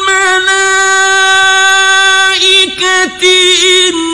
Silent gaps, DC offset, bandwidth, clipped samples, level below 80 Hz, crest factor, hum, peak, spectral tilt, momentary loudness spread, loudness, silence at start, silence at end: none; 1%; 12 kHz; 0.8%; -46 dBFS; 8 dB; none; 0 dBFS; 0.5 dB/octave; 3 LU; -6 LUFS; 0 s; 0 s